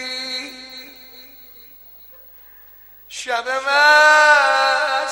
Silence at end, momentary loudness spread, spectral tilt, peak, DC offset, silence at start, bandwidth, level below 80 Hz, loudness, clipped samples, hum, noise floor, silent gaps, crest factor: 0 s; 24 LU; 1 dB/octave; -2 dBFS; under 0.1%; 0 s; 16.5 kHz; -62 dBFS; -14 LUFS; under 0.1%; 50 Hz at -60 dBFS; -44 dBFS; none; 16 dB